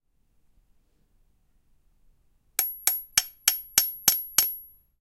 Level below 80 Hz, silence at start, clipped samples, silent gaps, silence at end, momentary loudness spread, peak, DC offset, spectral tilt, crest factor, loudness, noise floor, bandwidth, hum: -62 dBFS; 2.6 s; under 0.1%; none; 0.35 s; 7 LU; -2 dBFS; under 0.1%; 2 dB/octave; 28 dB; -24 LUFS; -65 dBFS; 16.5 kHz; none